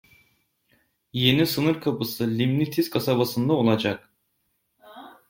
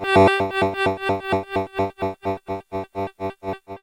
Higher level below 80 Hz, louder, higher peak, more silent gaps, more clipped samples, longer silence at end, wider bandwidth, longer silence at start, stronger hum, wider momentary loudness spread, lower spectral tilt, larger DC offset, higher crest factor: second, -60 dBFS vs -52 dBFS; about the same, -23 LUFS vs -23 LUFS; about the same, -4 dBFS vs -4 dBFS; neither; neither; first, 0.2 s vs 0.05 s; about the same, 16.5 kHz vs 16 kHz; first, 1.15 s vs 0 s; neither; second, 7 LU vs 14 LU; about the same, -6 dB/octave vs -6 dB/octave; neither; about the same, 22 dB vs 18 dB